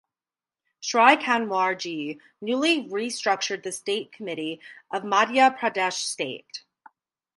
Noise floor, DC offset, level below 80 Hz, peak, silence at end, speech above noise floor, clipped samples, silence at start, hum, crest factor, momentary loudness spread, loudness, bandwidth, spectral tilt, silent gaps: under -90 dBFS; under 0.1%; -80 dBFS; -2 dBFS; 0.8 s; over 65 dB; under 0.1%; 0.8 s; none; 24 dB; 16 LU; -24 LUFS; 11.5 kHz; -2.5 dB/octave; none